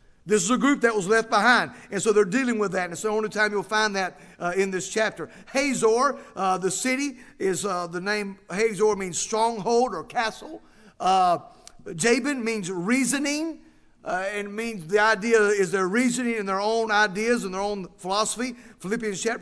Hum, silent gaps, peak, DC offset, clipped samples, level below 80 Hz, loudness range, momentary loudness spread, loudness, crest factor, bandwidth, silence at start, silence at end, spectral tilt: none; none; -4 dBFS; under 0.1%; under 0.1%; -58 dBFS; 3 LU; 10 LU; -24 LUFS; 20 dB; 11 kHz; 0.25 s; 0 s; -3.5 dB/octave